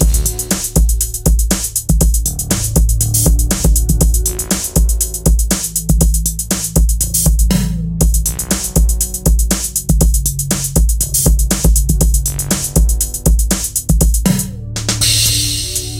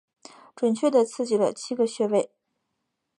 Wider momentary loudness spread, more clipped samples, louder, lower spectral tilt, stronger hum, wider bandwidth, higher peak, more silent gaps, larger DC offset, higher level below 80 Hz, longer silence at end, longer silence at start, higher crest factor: about the same, 4 LU vs 5 LU; neither; first, -14 LUFS vs -24 LUFS; about the same, -4 dB/octave vs -5 dB/octave; neither; first, 17.5 kHz vs 11.5 kHz; first, 0 dBFS vs -8 dBFS; neither; neither; first, -16 dBFS vs -80 dBFS; second, 0 s vs 0.95 s; second, 0 s vs 0.6 s; second, 12 dB vs 18 dB